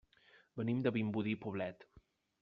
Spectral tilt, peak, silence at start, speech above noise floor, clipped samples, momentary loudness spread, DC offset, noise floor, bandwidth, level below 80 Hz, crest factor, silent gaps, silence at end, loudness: -6.5 dB/octave; -22 dBFS; 0.55 s; 30 dB; under 0.1%; 9 LU; under 0.1%; -68 dBFS; 5.2 kHz; -74 dBFS; 18 dB; none; 0.4 s; -38 LUFS